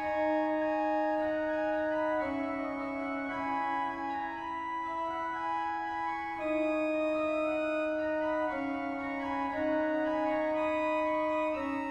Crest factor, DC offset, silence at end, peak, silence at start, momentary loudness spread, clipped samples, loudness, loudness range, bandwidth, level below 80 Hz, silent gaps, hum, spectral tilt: 12 dB; under 0.1%; 0 s; -20 dBFS; 0 s; 5 LU; under 0.1%; -32 LUFS; 3 LU; 9.2 kHz; -62 dBFS; none; none; -6 dB/octave